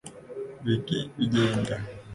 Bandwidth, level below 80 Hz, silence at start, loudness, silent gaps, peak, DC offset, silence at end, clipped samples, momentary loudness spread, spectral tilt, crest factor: 11.5 kHz; -54 dBFS; 0.05 s; -28 LUFS; none; -12 dBFS; under 0.1%; 0 s; under 0.1%; 15 LU; -6 dB/octave; 16 dB